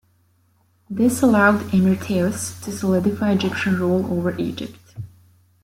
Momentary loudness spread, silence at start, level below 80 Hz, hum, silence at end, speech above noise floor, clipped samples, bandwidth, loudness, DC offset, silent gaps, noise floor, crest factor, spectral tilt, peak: 18 LU; 0.9 s; -54 dBFS; none; 0.6 s; 42 dB; under 0.1%; 16 kHz; -20 LUFS; under 0.1%; none; -61 dBFS; 20 dB; -6 dB/octave; -2 dBFS